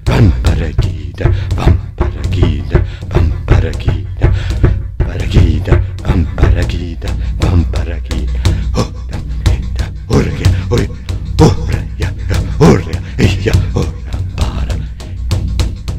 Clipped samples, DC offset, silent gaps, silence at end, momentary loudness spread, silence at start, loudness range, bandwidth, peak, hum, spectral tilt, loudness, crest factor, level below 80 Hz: 0.5%; under 0.1%; none; 0 s; 9 LU; 0 s; 3 LU; 12.5 kHz; 0 dBFS; none; -7 dB/octave; -14 LUFS; 12 dB; -16 dBFS